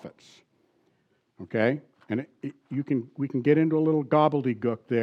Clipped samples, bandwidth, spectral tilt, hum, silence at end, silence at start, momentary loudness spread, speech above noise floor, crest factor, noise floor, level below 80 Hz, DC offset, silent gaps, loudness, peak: under 0.1%; 6.6 kHz; -9 dB/octave; none; 0 s; 0.05 s; 15 LU; 44 dB; 18 dB; -70 dBFS; -82 dBFS; under 0.1%; none; -26 LUFS; -8 dBFS